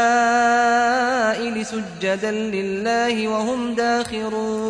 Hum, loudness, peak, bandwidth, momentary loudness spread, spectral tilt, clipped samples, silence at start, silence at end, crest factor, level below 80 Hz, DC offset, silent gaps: none; -20 LUFS; -8 dBFS; 10.5 kHz; 8 LU; -4 dB/octave; under 0.1%; 0 s; 0 s; 12 dB; -56 dBFS; under 0.1%; none